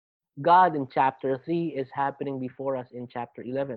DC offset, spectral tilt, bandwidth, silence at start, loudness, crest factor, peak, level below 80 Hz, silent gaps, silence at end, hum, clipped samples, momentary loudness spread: under 0.1%; -9.5 dB/octave; 4.9 kHz; 0.35 s; -26 LUFS; 18 dB; -8 dBFS; -72 dBFS; none; 0 s; none; under 0.1%; 16 LU